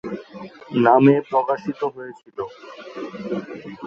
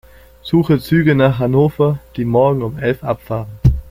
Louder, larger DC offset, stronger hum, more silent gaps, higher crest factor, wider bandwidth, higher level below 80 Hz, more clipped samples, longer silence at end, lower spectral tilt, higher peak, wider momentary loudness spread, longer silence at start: second, -19 LUFS vs -16 LUFS; neither; neither; neither; first, 20 dB vs 14 dB; second, 6.6 kHz vs 16 kHz; second, -66 dBFS vs -30 dBFS; neither; about the same, 0 s vs 0 s; about the same, -8.5 dB/octave vs -8.5 dB/octave; about the same, -2 dBFS vs -2 dBFS; first, 23 LU vs 8 LU; second, 0.05 s vs 0.45 s